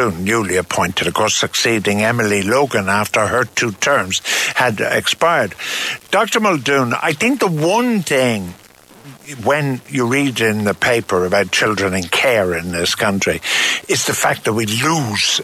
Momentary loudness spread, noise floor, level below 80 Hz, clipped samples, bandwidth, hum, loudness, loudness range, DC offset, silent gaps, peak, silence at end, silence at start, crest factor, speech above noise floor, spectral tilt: 4 LU; -41 dBFS; -46 dBFS; under 0.1%; 16 kHz; none; -16 LUFS; 2 LU; under 0.1%; none; -4 dBFS; 0 s; 0 s; 12 dB; 24 dB; -3.5 dB/octave